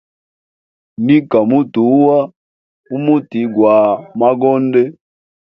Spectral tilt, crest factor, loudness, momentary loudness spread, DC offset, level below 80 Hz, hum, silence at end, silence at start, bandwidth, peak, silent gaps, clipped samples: -10.5 dB/octave; 14 dB; -13 LUFS; 9 LU; under 0.1%; -60 dBFS; none; 0.5 s; 1 s; 5 kHz; 0 dBFS; 2.36-2.84 s; under 0.1%